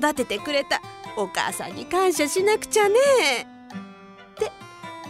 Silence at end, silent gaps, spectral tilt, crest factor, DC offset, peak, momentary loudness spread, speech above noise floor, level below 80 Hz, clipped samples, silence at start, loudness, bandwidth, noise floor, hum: 0 s; none; -2.5 dB/octave; 16 dB; under 0.1%; -8 dBFS; 21 LU; 23 dB; -60 dBFS; under 0.1%; 0 s; -22 LUFS; 16 kHz; -45 dBFS; none